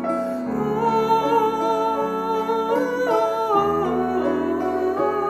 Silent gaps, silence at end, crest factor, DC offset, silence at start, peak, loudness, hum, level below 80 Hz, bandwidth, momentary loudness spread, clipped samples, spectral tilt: none; 0 s; 14 dB; under 0.1%; 0 s; -6 dBFS; -21 LUFS; none; -52 dBFS; 13.5 kHz; 4 LU; under 0.1%; -6 dB/octave